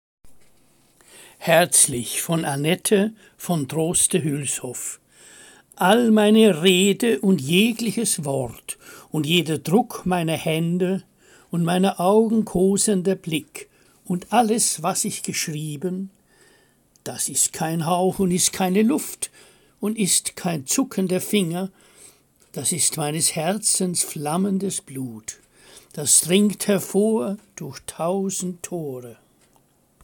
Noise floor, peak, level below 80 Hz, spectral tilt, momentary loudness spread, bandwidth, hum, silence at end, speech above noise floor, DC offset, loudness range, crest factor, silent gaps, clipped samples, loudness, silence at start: -60 dBFS; -2 dBFS; -58 dBFS; -4 dB/octave; 15 LU; 17 kHz; none; 0.9 s; 39 dB; under 0.1%; 5 LU; 20 dB; none; under 0.1%; -21 LUFS; 0.25 s